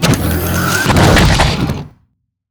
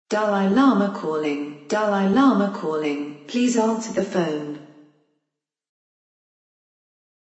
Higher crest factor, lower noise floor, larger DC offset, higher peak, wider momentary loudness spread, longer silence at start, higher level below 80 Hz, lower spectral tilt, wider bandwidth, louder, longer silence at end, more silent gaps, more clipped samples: second, 12 dB vs 18 dB; second, -60 dBFS vs -83 dBFS; neither; first, 0 dBFS vs -4 dBFS; about the same, 10 LU vs 12 LU; about the same, 0 s vs 0.1 s; first, -22 dBFS vs -68 dBFS; second, -4.5 dB/octave vs -6 dB/octave; first, over 20 kHz vs 8.2 kHz; first, -12 LUFS vs -21 LUFS; second, 0.65 s vs 2.55 s; neither; neither